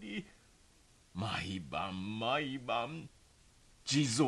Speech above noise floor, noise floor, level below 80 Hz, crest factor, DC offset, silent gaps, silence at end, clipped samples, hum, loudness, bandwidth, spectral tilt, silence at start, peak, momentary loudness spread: 30 dB; -65 dBFS; -64 dBFS; 20 dB; under 0.1%; none; 0 s; under 0.1%; none; -37 LUFS; 12 kHz; -4.5 dB/octave; 0 s; -18 dBFS; 15 LU